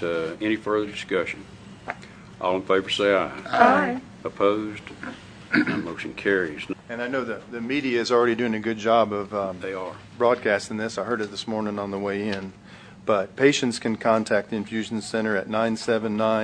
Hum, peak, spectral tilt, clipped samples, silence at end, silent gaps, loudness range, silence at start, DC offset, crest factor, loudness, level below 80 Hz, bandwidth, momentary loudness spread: none; 0 dBFS; -5 dB/octave; under 0.1%; 0 s; none; 4 LU; 0 s; under 0.1%; 24 dB; -24 LUFS; -60 dBFS; 10.5 kHz; 14 LU